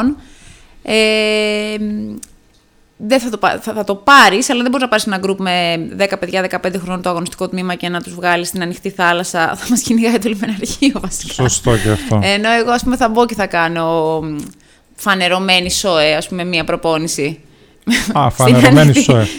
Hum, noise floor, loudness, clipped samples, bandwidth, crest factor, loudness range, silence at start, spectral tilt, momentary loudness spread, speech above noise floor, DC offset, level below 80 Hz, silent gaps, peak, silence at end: none; -51 dBFS; -14 LUFS; 0.1%; over 20 kHz; 14 dB; 5 LU; 0 s; -4.5 dB/octave; 12 LU; 37 dB; under 0.1%; -38 dBFS; none; 0 dBFS; 0 s